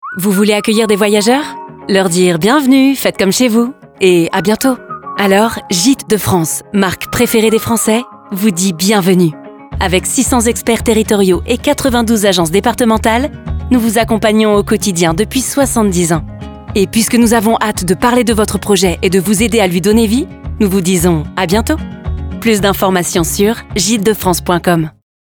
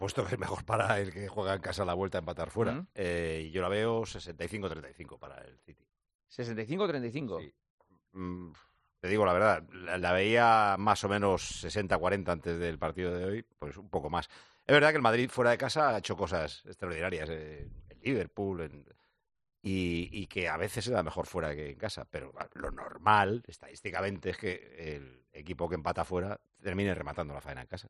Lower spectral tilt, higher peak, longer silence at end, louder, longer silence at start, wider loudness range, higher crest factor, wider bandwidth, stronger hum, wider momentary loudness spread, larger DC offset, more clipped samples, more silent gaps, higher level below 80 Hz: about the same, -4.5 dB/octave vs -5.5 dB/octave; first, 0 dBFS vs -8 dBFS; first, 0.4 s vs 0 s; first, -12 LUFS vs -32 LUFS; about the same, 0.05 s vs 0 s; second, 2 LU vs 10 LU; second, 12 dB vs 24 dB; first, over 20 kHz vs 11.5 kHz; neither; second, 6 LU vs 17 LU; neither; neither; second, none vs 6.15-6.19 s, 7.70-7.78 s; first, -30 dBFS vs -58 dBFS